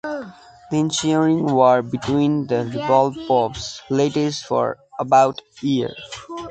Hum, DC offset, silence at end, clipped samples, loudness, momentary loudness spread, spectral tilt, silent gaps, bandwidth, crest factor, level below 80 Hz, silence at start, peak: none; under 0.1%; 0 s; under 0.1%; -19 LUFS; 14 LU; -5.5 dB/octave; none; 9.2 kHz; 18 dB; -54 dBFS; 0.05 s; -2 dBFS